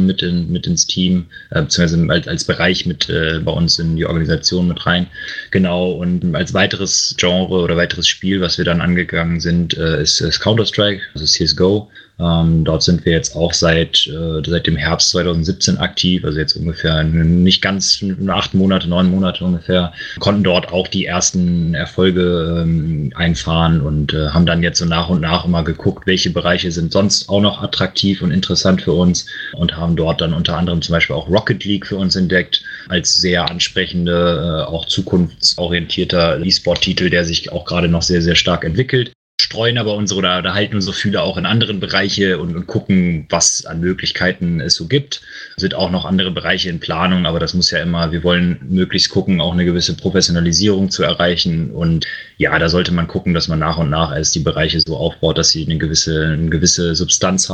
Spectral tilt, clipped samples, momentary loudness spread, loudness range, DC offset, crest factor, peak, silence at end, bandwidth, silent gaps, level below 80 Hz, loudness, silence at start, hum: -4 dB/octave; under 0.1%; 5 LU; 2 LU; under 0.1%; 16 dB; 0 dBFS; 0 s; 9 kHz; 39.15-39.38 s; -34 dBFS; -15 LUFS; 0 s; none